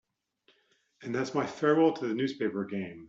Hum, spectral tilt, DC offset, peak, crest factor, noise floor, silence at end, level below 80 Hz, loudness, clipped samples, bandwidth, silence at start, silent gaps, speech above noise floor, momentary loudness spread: none; -6.5 dB/octave; under 0.1%; -12 dBFS; 20 dB; -70 dBFS; 0 s; -76 dBFS; -30 LUFS; under 0.1%; 7.8 kHz; 1 s; none; 41 dB; 12 LU